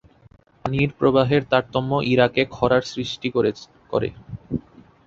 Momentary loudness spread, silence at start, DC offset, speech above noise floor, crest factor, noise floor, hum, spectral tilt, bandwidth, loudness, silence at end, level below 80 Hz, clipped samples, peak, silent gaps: 13 LU; 0.65 s; under 0.1%; 33 dB; 20 dB; -53 dBFS; none; -6.5 dB/octave; 7.8 kHz; -22 LUFS; 0.45 s; -48 dBFS; under 0.1%; -2 dBFS; none